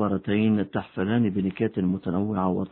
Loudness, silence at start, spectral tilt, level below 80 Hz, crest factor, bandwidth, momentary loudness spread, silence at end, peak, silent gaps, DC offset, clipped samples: -25 LUFS; 0 s; -12 dB/octave; -58 dBFS; 14 dB; 4.1 kHz; 4 LU; 0.05 s; -10 dBFS; none; under 0.1%; under 0.1%